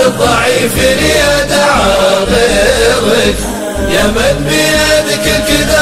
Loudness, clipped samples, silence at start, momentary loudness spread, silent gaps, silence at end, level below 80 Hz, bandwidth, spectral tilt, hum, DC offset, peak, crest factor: -9 LUFS; under 0.1%; 0 s; 3 LU; none; 0 s; -24 dBFS; 16.5 kHz; -3.5 dB/octave; none; under 0.1%; 0 dBFS; 10 dB